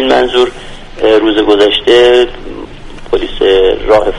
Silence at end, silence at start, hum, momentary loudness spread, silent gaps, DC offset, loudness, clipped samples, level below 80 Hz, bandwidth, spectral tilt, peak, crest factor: 0 s; 0 s; none; 20 LU; none; under 0.1%; -9 LUFS; 0.3%; -28 dBFS; 11 kHz; -4.5 dB/octave; 0 dBFS; 10 dB